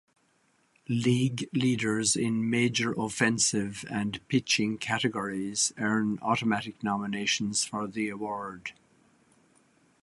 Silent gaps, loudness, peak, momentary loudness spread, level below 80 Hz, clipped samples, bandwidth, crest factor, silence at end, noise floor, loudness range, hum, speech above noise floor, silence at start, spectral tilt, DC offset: none; -28 LUFS; -8 dBFS; 7 LU; -66 dBFS; under 0.1%; 11.5 kHz; 22 dB; 1.3 s; -69 dBFS; 4 LU; none; 40 dB; 0.9 s; -3.5 dB/octave; under 0.1%